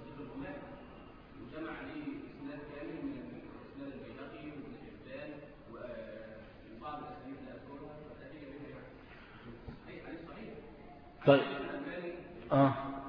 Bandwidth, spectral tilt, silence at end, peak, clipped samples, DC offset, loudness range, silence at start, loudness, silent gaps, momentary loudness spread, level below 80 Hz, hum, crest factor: 5.2 kHz; -5.5 dB/octave; 0 s; -12 dBFS; under 0.1%; under 0.1%; 14 LU; 0 s; -38 LUFS; none; 22 LU; -62 dBFS; none; 28 dB